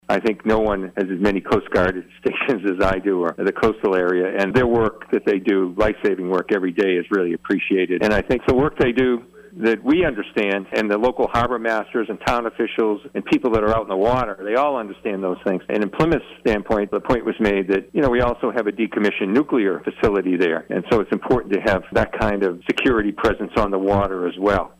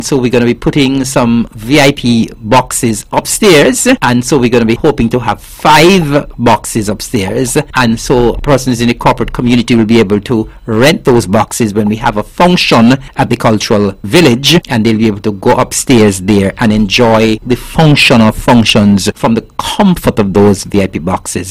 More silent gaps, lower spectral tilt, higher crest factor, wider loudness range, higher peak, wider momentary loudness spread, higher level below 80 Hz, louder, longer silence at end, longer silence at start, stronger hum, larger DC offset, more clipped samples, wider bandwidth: neither; first, -7 dB/octave vs -5 dB/octave; about the same, 12 dB vs 8 dB; about the same, 2 LU vs 2 LU; second, -8 dBFS vs 0 dBFS; second, 4 LU vs 8 LU; second, -38 dBFS vs -30 dBFS; second, -20 LUFS vs -9 LUFS; first, 0.15 s vs 0 s; about the same, 0.1 s vs 0 s; neither; second, under 0.1% vs 0.9%; second, under 0.1% vs 0.3%; second, 12.5 kHz vs 16 kHz